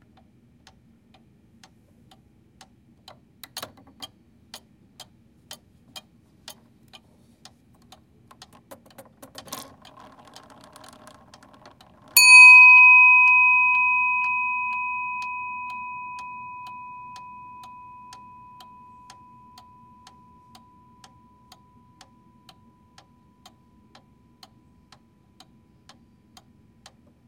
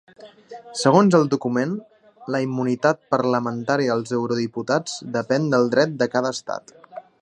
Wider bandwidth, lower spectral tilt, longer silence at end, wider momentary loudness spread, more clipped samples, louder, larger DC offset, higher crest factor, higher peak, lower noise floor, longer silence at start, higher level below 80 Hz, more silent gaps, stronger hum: first, 16.5 kHz vs 10.5 kHz; second, 1.5 dB/octave vs -5.5 dB/octave; first, 10.45 s vs 0.2 s; first, 32 LU vs 16 LU; neither; first, -12 LUFS vs -21 LUFS; neither; about the same, 24 dB vs 20 dB; about the same, 0 dBFS vs 0 dBFS; first, -57 dBFS vs -42 dBFS; first, 3.55 s vs 0.2 s; about the same, -68 dBFS vs -68 dBFS; neither; neither